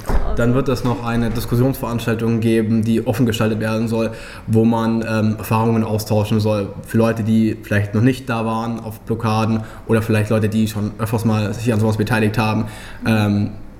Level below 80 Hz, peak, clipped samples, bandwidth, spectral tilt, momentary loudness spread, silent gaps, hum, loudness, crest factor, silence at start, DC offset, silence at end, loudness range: -32 dBFS; -2 dBFS; under 0.1%; 16 kHz; -7 dB/octave; 6 LU; none; none; -18 LUFS; 16 dB; 0 s; under 0.1%; 0 s; 1 LU